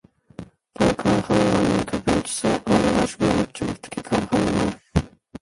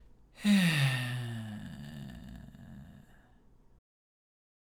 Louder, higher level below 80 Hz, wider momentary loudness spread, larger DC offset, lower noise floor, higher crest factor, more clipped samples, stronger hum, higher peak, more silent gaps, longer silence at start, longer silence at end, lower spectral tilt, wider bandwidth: first, -22 LUFS vs -30 LUFS; first, -40 dBFS vs -60 dBFS; second, 11 LU vs 25 LU; neither; second, -42 dBFS vs -61 dBFS; about the same, 18 dB vs 20 dB; neither; neither; first, -4 dBFS vs -16 dBFS; neither; about the same, 0.4 s vs 0.35 s; second, 0.05 s vs 1.75 s; about the same, -5.5 dB/octave vs -5 dB/octave; second, 11.5 kHz vs 19.5 kHz